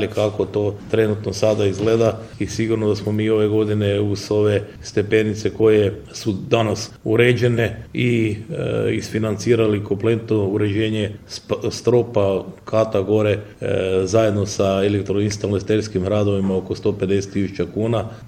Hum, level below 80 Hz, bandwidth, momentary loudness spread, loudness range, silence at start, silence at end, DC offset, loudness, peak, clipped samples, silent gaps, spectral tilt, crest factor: none; -48 dBFS; 15 kHz; 7 LU; 2 LU; 0 s; 0 s; under 0.1%; -20 LUFS; -2 dBFS; under 0.1%; none; -6.5 dB/octave; 18 dB